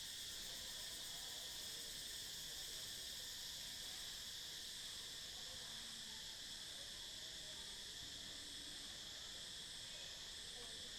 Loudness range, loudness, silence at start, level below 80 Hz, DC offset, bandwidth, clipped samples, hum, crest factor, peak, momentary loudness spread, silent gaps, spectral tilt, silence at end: 2 LU; -48 LUFS; 0 s; -70 dBFS; under 0.1%; 19.5 kHz; under 0.1%; none; 14 dB; -36 dBFS; 2 LU; none; 0 dB/octave; 0 s